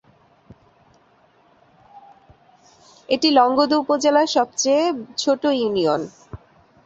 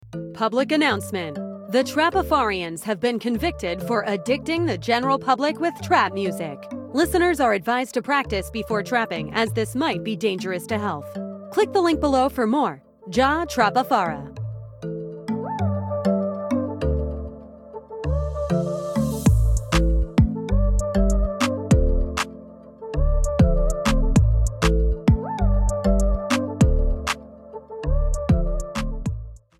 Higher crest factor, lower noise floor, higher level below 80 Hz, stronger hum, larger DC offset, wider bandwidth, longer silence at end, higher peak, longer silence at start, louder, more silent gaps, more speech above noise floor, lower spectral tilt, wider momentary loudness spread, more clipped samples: about the same, 20 dB vs 18 dB; first, -57 dBFS vs -42 dBFS; second, -60 dBFS vs -26 dBFS; neither; neither; second, 8 kHz vs 16 kHz; first, 0.5 s vs 0.2 s; about the same, -2 dBFS vs -4 dBFS; first, 1.95 s vs 0.05 s; first, -19 LUFS vs -23 LUFS; neither; first, 38 dB vs 20 dB; second, -3 dB/octave vs -6 dB/octave; second, 8 LU vs 12 LU; neither